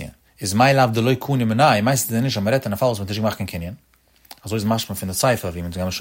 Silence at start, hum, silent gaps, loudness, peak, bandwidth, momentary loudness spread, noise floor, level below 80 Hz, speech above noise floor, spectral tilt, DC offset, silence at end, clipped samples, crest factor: 0 s; none; none; -20 LUFS; -2 dBFS; 16.5 kHz; 13 LU; -47 dBFS; -48 dBFS; 28 dB; -5 dB/octave; under 0.1%; 0 s; under 0.1%; 18 dB